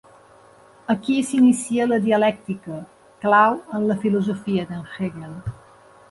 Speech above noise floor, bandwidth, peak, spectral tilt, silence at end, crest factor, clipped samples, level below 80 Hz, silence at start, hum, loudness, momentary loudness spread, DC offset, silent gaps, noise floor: 30 dB; 11.5 kHz; -4 dBFS; -6 dB/octave; 0.6 s; 18 dB; under 0.1%; -54 dBFS; 0.9 s; none; -21 LUFS; 17 LU; under 0.1%; none; -50 dBFS